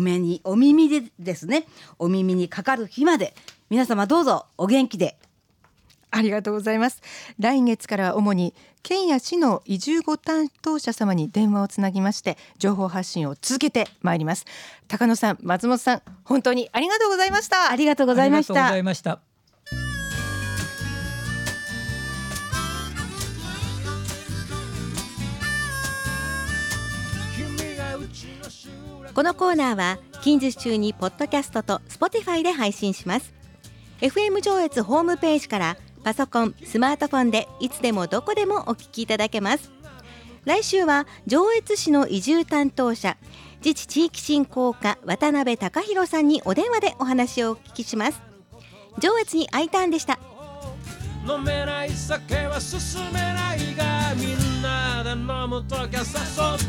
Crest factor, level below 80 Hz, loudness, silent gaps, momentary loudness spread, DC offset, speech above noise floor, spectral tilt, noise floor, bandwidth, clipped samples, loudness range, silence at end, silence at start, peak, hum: 16 dB; -44 dBFS; -23 LUFS; none; 10 LU; under 0.1%; 39 dB; -5 dB/octave; -61 dBFS; 17.5 kHz; under 0.1%; 7 LU; 0 s; 0 s; -6 dBFS; none